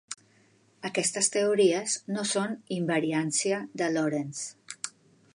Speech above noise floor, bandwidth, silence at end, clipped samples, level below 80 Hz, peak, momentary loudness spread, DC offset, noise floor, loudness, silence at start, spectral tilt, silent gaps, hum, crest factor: 35 dB; 11.5 kHz; 0.45 s; under 0.1%; -82 dBFS; -8 dBFS; 14 LU; under 0.1%; -63 dBFS; -28 LUFS; 0.1 s; -3.5 dB/octave; none; none; 20 dB